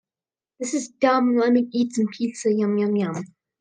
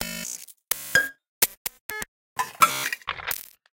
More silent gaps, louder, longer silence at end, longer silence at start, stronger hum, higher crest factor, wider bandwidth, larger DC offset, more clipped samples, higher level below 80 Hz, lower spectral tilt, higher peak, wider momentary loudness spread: second, none vs 1.29-1.41 s, 1.57-1.65 s, 1.81-1.89 s, 2.08-2.36 s; first, -22 LUFS vs -26 LUFS; about the same, 0.35 s vs 0.35 s; first, 0.6 s vs 0 s; neither; second, 18 dB vs 26 dB; second, 9.8 kHz vs 17 kHz; neither; neither; second, -76 dBFS vs -58 dBFS; first, -5.5 dB/octave vs 0 dB/octave; second, -6 dBFS vs -2 dBFS; second, 10 LU vs 13 LU